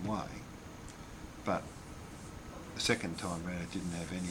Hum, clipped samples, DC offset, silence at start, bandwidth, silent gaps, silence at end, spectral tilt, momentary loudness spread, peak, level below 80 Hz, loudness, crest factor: none; under 0.1%; under 0.1%; 0 s; 19.5 kHz; none; 0 s; -4.5 dB/octave; 16 LU; -16 dBFS; -56 dBFS; -39 LUFS; 24 dB